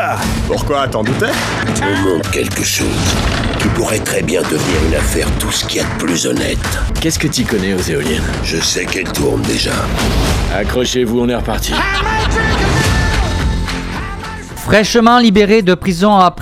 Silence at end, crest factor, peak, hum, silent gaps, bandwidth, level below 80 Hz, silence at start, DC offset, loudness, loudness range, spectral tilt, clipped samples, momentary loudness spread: 0 s; 14 dB; 0 dBFS; none; none; 16 kHz; -22 dBFS; 0 s; under 0.1%; -14 LUFS; 3 LU; -4.5 dB/octave; under 0.1%; 7 LU